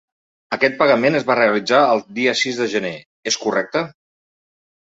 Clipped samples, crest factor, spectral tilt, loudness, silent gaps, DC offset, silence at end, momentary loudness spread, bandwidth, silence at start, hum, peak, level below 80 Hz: under 0.1%; 18 dB; -3.5 dB/octave; -17 LUFS; 3.06-3.23 s; under 0.1%; 0.95 s; 11 LU; 8 kHz; 0.5 s; none; 0 dBFS; -64 dBFS